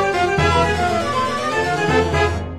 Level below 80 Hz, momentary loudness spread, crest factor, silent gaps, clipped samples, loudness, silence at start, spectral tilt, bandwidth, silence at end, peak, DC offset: -34 dBFS; 4 LU; 16 dB; none; under 0.1%; -18 LUFS; 0 s; -5 dB/octave; 13.5 kHz; 0 s; -2 dBFS; under 0.1%